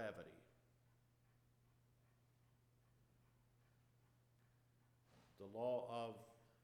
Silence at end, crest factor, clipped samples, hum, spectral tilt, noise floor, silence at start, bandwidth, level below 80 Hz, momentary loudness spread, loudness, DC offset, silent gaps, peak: 0.2 s; 22 dB; under 0.1%; none; -6 dB/octave; -76 dBFS; 0 s; 14 kHz; -86 dBFS; 18 LU; -48 LUFS; under 0.1%; none; -34 dBFS